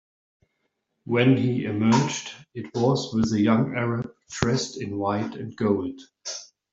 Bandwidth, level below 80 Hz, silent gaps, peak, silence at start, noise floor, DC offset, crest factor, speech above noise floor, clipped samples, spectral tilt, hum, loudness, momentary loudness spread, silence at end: 7.8 kHz; -56 dBFS; none; -2 dBFS; 1.05 s; -76 dBFS; under 0.1%; 22 dB; 52 dB; under 0.1%; -6 dB/octave; none; -24 LUFS; 14 LU; 0.25 s